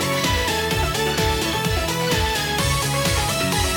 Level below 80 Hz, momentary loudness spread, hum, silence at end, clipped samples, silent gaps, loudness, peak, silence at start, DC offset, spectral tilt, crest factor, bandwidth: -30 dBFS; 1 LU; none; 0 s; under 0.1%; none; -20 LUFS; -8 dBFS; 0 s; under 0.1%; -3.5 dB/octave; 12 dB; 19 kHz